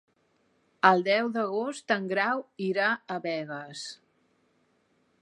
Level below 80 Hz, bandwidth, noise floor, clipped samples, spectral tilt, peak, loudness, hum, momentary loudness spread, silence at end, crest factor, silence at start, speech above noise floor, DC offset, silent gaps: -86 dBFS; 11.5 kHz; -70 dBFS; under 0.1%; -4.5 dB/octave; -4 dBFS; -27 LUFS; none; 15 LU; 1.25 s; 24 dB; 0.85 s; 42 dB; under 0.1%; none